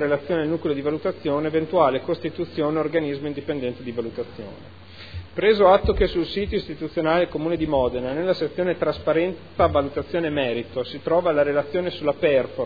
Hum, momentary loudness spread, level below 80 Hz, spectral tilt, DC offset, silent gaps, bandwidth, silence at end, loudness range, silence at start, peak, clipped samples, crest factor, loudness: none; 10 LU; -42 dBFS; -8.5 dB/octave; 0.4%; none; 5 kHz; 0 s; 4 LU; 0 s; -2 dBFS; under 0.1%; 20 dB; -23 LUFS